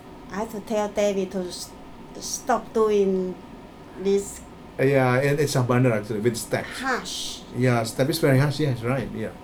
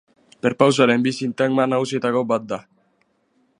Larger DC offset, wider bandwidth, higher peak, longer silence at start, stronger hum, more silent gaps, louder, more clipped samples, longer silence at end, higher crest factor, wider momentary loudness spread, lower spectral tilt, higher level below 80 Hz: neither; first, 19 kHz vs 11 kHz; second, -6 dBFS vs 0 dBFS; second, 0 s vs 0.45 s; neither; neither; second, -24 LUFS vs -19 LUFS; neither; second, 0 s vs 1 s; about the same, 18 dB vs 20 dB; first, 16 LU vs 9 LU; about the same, -5.5 dB/octave vs -5.5 dB/octave; first, -50 dBFS vs -68 dBFS